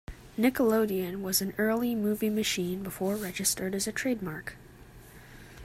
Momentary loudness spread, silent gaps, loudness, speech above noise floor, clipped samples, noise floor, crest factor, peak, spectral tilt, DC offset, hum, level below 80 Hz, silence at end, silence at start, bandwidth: 13 LU; none; -29 LUFS; 22 dB; under 0.1%; -51 dBFS; 18 dB; -12 dBFS; -4 dB/octave; under 0.1%; none; -56 dBFS; 0 s; 0.1 s; 16 kHz